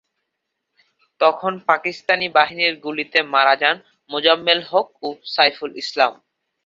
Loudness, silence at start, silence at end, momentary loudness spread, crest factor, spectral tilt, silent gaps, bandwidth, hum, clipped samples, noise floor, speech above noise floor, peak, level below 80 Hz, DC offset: -18 LUFS; 1.2 s; 0.5 s; 11 LU; 20 dB; -3.5 dB/octave; none; 7.6 kHz; none; under 0.1%; -78 dBFS; 59 dB; -2 dBFS; -72 dBFS; under 0.1%